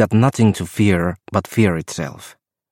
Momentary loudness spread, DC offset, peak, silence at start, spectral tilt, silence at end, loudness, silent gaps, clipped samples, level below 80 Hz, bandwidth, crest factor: 12 LU; under 0.1%; -2 dBFS; 0 s; -6.5 dB/octave; 0.45 s; -18 LUFS; none; under 0.1%; -46 dBFS; 16.5 kHz; 16 dB